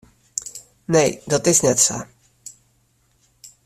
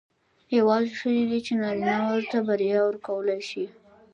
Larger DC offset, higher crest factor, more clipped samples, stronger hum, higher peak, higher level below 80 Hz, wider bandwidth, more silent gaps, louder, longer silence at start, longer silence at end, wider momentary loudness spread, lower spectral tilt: neither; first, 22 dB vs 16 dB; neither; neither; first, -2 dBFS vs -10 dBFS; first, -56 dBFS vs -70 dBFS; first, 15.5 kHz vs 9.4 kHz; neither; first, -18 LUFS vs -25 LUFS; second, 0.35 s vs 0.5 s; second, 0.15 s vs 0.45 s; first, 25 LU vs 7 LU; second, -3.5 dB/octave vs -6 dB/octave